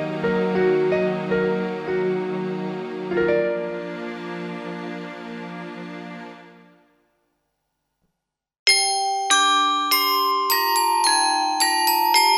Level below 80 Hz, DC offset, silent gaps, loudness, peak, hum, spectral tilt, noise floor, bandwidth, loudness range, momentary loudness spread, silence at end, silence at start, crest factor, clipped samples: -62 dBFS; under 0.1%; 8.59-8.66 s; -20 LUFS; 0 dBFS; none; -2.5 dB/octave; -80 dBFS; 19 kHz; 18 LU; 17 LU; 0 s; 0 s; 22 dB; under 0.1%